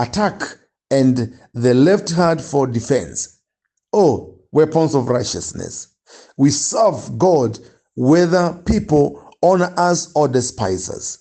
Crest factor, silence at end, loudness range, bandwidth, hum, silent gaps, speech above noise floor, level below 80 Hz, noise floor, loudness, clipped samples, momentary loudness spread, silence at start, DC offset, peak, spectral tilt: 16 dB; 0.05 s; 2 LU; 9 kHz; none; none; 59 dB; -44 dBFS; -76 dBFS; -17 LUFS; under 0.1%; 12 LU; 0 s; under 0.1%; -2 dBFS; -5.5 dB/octave